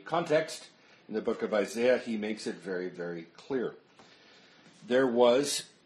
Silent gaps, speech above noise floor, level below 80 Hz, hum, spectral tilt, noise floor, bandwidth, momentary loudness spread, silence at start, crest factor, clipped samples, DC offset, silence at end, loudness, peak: none; 28 dB; -78 dBFS; none; -4 dB/octave; -58 dBFS; 13 kHz; 15 LU; 0.05 s; 20 dB; under 0.1%; under 0.1%; 0.2 s; -30 LUFS; -10 dBFS